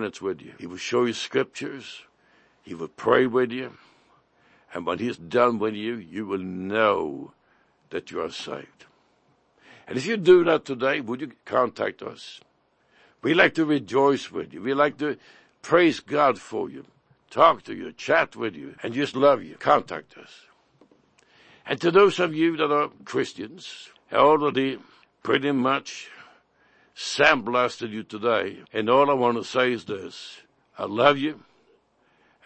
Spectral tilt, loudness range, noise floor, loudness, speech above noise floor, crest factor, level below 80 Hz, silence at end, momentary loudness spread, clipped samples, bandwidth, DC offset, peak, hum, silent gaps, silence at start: -5 dB/octave; 5 LU; -65 dBFS; -23 LUFS; 41 dB; 22 dB; -68 dBFS; 1.1 s; 19 LU; under 0.1%; 8.6 kHz; under 0.1%; -2 dBFS; none; none; 0 s